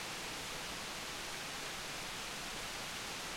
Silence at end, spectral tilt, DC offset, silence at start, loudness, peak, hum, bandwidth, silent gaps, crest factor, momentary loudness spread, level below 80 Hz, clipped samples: 0 s; -1.5 dB/octave; under 0.1%; 0 s; -42 LUFS; -30 dBFS; none; 16.5 kHz; none; 14 dB; 0 LU; -60 dBFS; under 0.1%